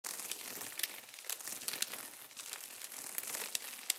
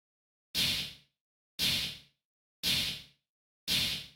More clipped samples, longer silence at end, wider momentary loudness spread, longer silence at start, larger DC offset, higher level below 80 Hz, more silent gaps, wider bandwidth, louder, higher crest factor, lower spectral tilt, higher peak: neither; about the same, 0 s vs 0.05 s; second, 7 LU vs 14 LU; second, 0.05 s vs 0.55 s; neither; second, under -90 dBFS vs -58 dBFS; second, none vs 1.20-1.58 s, 2.25-2.63 s, 3.29-3.67 s; about the same, 16.5 kHz vs 18 kHz; second, -41 LUFS vs -31 LUFS; first, 32 dB vs 18 dB; second, 1.5 dB/octave vs -1 dB/octave; first, -10 dBFS vs -20 dBFS